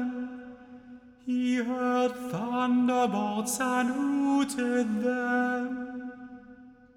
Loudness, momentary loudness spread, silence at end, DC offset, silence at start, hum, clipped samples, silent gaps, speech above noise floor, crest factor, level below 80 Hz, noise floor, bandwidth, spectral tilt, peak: -28 LUFS; 20 LU; 0.25 s; under 0.1%; 0 s; none; under 0.1%; none; 24 dB; 14 dB; -68 dBFS; -52 dBFS; 15.5 kHz; -4.5 dB/octave; -16 dBFS